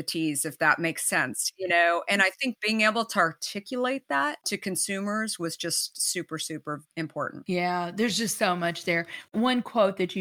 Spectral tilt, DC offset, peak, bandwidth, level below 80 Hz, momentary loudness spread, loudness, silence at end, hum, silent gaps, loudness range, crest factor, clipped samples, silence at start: -3 dB/octave; under 0.1%; -6 dBFS; over 20 kHz; -76 dBFS; 10 LU; -26 LUFS; 0 s; none; none; 5 LU; 22 dB; under 0.1%; 0 s